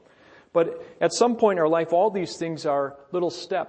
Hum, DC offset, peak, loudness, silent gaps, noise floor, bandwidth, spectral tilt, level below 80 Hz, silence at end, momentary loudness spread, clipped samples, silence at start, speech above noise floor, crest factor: none; under 0.1%; -6 dBFS; -24 LUFS; none; -53 dBFS; 8.8 kHz; -4.5 dB/octave; -70 dBFS; 0 s; 8 LU; under 0.1%; 0.55 s; 30 dB; 18 dB